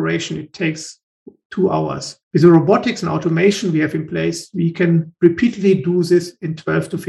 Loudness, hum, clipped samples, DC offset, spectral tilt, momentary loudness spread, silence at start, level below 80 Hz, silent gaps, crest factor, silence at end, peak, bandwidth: -17 LUFS; none; under 0.1%; under 0.1%; -6.5 dB/octave; 12 LU; 0 s; -56 dBFS; 1.03-1.26 s, 1.45-1.50 s, 2.23-2.31 s; 16 dB; 0 s; 0 dBFS; 12 kHz